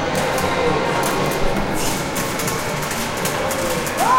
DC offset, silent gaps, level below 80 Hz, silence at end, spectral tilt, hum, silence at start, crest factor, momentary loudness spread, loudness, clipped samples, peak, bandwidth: under 0.1%; none; -34 dBFS; 0 s; -3.5 dB/octave; none; 0 s; 14 dB; 3 LU; -20 LUFS; under 0.1%; -4 dBFS; 17 kHz